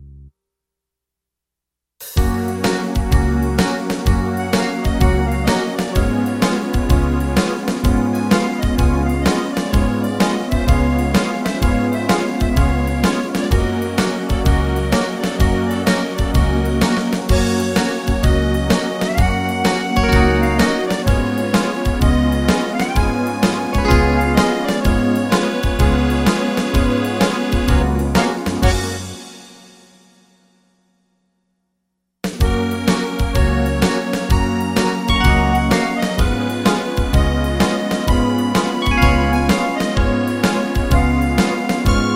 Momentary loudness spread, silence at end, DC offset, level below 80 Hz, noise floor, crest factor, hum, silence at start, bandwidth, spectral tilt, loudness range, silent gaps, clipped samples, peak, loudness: 4 LU; 0 s; under 0.1%; -22 dBFS; -83 dBFS; 16 dB; none; 0 s; 16.5 kHz; -5.5 dB/octave; 4 LU; none; under 0.1%; -2 dBFS; -17 LUFS